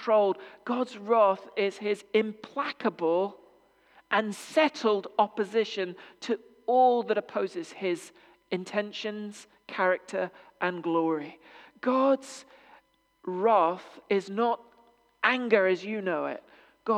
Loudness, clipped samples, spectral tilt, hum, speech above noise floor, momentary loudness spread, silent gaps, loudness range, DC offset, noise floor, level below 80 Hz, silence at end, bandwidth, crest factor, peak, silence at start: -28 LUFS; under 0.1%; -5 dB/octave; none; 35 dB; 13 LU; none; 4 LU; under 0.1%; -63 dBFS; -82 dBFS; 0 s; 13 kHz; 22 dB; -8 dBFS; 0 s